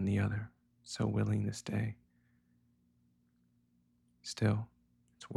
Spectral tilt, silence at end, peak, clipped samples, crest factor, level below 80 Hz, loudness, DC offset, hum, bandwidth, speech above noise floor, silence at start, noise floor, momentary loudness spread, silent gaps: -6.5 dB/octave; 0 s; -18 dBFS; under 0.1%; 20 dB; -64 dBFS; -36 LUFS; under 0.1%; 60 Hz at -65 dBFS; 11.5 kHz; 39 dB; 0 s; -73 dBFS; 17 LU; none